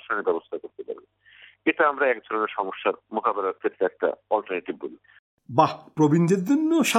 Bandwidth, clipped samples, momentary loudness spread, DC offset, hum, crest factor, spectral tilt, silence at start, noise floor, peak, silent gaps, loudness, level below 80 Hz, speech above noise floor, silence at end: 16 kHz; under 0.1%; 15 LU; under 0.1%; none; 22 dB; -5.5 dB/octave; 0.1 s; -53 dBFS; -4 dBFS; 5.19-5.38 s; -24 LUFS; -74 dBFS; 29 dB; 0 s